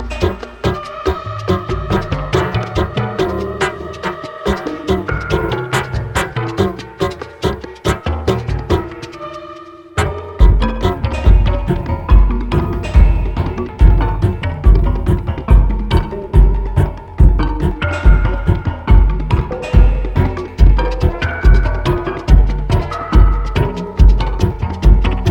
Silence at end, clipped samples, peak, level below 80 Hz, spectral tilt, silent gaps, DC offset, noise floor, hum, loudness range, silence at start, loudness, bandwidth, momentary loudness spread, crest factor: 0 s; under 0.1%; 0 dBFS; -14 dBFS; -7 dB/octave; none; under 0.1%; -34 dBFS; none; 4 LU; 0 s; -16 LUFS; 9.6 kHz; 8 LU; 14 dB